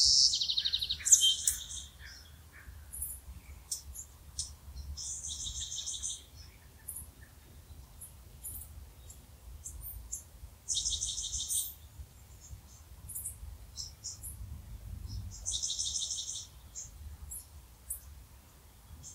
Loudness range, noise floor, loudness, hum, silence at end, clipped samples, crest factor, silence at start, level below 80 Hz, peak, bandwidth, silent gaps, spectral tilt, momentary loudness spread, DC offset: 16 LU; -57 dBFS; -33 LUFS; none; 0 s; under 0.1%; 30 dB; 0 s; -52 dBFS; -8 dBFS; 16 kHz; none; 0.5 dB/octave; 24 LU; under 0.1%